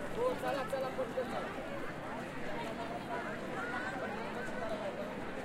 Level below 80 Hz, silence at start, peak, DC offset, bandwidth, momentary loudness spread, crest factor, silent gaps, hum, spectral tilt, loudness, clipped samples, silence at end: -58 dBFS; 0 s; -22 dBFS; under 0.1%; 16.5 kHz; 5 LU; 16 dB; none; none; -5.5 dB/octave; -39 LUFS; under 0.1%; 0 s